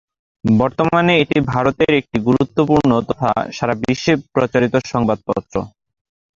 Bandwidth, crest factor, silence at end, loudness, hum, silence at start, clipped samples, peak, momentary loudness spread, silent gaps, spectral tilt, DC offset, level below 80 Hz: 7.6 kHz; 14 dB; 0.7 s; -17 LUFS; none; 0.45 s; under 0.1%; -2 dBFS; 8 LU; none; -6.5 dB/octave; under 0.1%; -46 dBFS